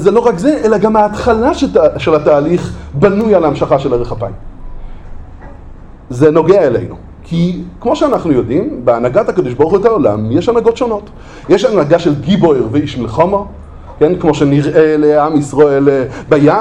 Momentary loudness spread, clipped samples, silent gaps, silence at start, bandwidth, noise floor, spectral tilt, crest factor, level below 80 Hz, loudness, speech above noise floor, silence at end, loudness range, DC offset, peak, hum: 9 LU; 0.1%; none; 0 s; 10 kHz; -31 dBFS; -7.5 dB/octave; 12 dB; -32 dBFS; -11 LUFS; 21 dB; 0 s; 4 LU; under 0.1%; 0 dBFS; none